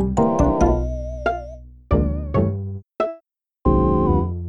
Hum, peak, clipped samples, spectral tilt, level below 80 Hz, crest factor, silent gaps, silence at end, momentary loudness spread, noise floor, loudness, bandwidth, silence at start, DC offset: none; -4 dBFS; under 0.1%; -9 dB/octave; -26 dBFS; 16 dB; none; 0 s; 12 LU; -54 dBFS; -21 LUFS; 7.6 kHz; 0 s; under 0.1%